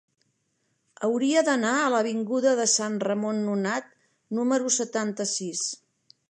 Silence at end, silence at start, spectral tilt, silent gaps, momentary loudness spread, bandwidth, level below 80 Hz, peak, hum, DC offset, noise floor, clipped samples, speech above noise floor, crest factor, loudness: 0.55 s; 1 s; -3 dB/octave; none; 8 LU; 11 kHz; -82 dBFS; -10 dBFS; none; under 0.1%; -74 dBFS; under 0.1%; 49 dB; 18 dB; -25 LUFS